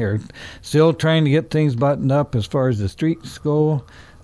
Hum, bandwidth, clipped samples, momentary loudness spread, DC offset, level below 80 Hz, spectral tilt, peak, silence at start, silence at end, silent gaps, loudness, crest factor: none; 11 kHz; under 0.1%; 10 LU; under 0.1%; -46 dBFS; -7.5 dB/octave; -4 dBFS; 0 s; 0.2 s; none; -19 LUFS; 14 dB